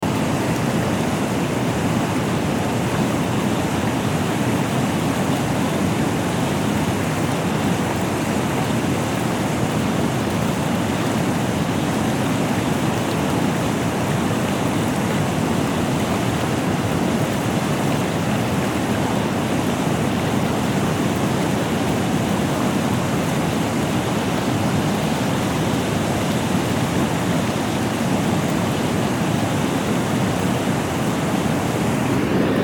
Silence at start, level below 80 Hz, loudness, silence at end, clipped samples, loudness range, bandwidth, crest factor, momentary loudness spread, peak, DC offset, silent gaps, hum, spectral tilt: 0 s; -42 dBFS; -21 LUFS; 0 s; under 0.1%; 0 LU; 19 kHz; 14 dB; 1 LU; -6 dBFS; under 0.1%; none; none; -5.5 dB/octave